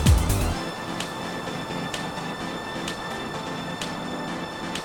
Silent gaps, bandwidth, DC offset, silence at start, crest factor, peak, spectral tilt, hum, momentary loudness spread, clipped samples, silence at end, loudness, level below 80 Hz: none; 17.5 kHz; under 0.1%; 0 s; 20 dB; -6 dBFS; -4.5 dB/octave; none; 6 LU; under 0.1%; 0 s; -29 LUFS; -34 dBFS